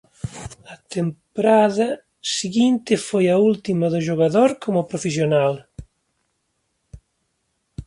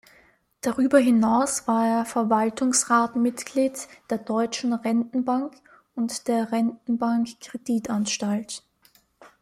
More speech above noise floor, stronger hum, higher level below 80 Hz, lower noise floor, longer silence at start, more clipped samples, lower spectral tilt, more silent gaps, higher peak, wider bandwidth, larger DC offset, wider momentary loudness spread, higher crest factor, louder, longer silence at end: first, 53 dB vs 38 dB; neither; first, -52 dBFS vs -66 dBFS; first, -72 dBFS vs -61 dBFS; second, 0.25 s vs 0.65 s; neither; first, -5.5 dB/octave vs -4 dB/octave; neither; about the same, -4 dBFS vs -6 dBFS; second, 11.5 kHz vs 15.5 kHz; neither; first, 16 LU vs 12 LU; about the same, 18 dB vs 20 dB; first, -20 LUFS vs -24 LUFS; about the same, 0.05 s vs 0.15 s